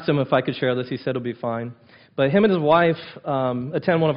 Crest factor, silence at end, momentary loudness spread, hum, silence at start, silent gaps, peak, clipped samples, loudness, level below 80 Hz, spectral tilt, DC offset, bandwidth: 16 dB; 0 s; 11 LU; none; 0 s; none; -6 dBFS; under 0.1%; -22 LUFS; -60 dBFS; -10.5 dB/octave; under 0.1%; 5.4 kHz